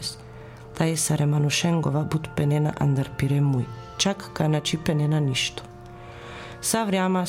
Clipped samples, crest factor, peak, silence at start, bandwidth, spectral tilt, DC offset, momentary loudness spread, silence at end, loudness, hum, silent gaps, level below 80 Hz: under 0.1%; 16 dB; -8 dBFS; 0 s; 16 kHz; -5 dB/octave; under 0.1%; 19 LU; 0 s; -24 LUFS; none; none; -50 dBFS